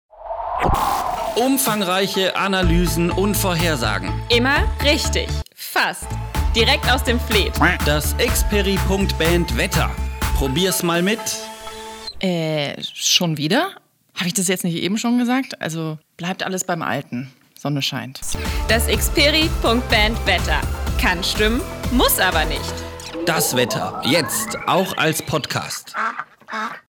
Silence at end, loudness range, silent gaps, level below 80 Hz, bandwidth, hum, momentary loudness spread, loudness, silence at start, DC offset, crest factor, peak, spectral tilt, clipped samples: 0.1 s; 4 LU; none; -28 dBFS; over 20 kHz; none; 11 LU; -19 LUFS; 0.15 s; under 0.1%; 18 dB; -2 dBFS; -3.5 dB/octave; under 0.1%